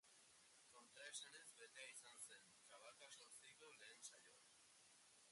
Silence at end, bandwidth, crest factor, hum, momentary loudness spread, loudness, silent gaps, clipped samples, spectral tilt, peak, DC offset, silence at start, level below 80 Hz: 0 s; 11.5 kHz; 22 dB; none; 13 LU; -61 LUFS; none; under 0.1%; 1 dB/octave; -42 dBFS; under 0.1%; 0.05 s; under -90 dBFS